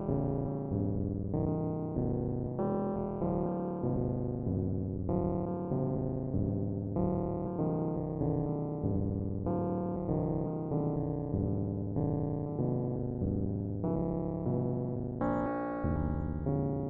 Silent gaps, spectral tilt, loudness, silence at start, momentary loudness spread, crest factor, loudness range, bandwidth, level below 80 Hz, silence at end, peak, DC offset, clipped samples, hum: none; -13 dB/octave; -34 LUFS; 0 s; 2 LU; 16 dB; 0 LU; 2.8 kHz; -48 dBFS; 0 s; -18 dBFS; under 0.1%; under 0.1%; none